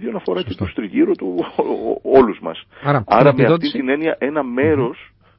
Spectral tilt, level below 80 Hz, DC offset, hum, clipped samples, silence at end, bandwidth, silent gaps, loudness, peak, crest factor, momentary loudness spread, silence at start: -10.5 dB/octave; -46 dBFS; under 0.1%; none; under 0.1%; 0.35 s; 5.8 kHz; none; -17 LUFS; 0 dBFS; 18 dB; 12 LU; 0 s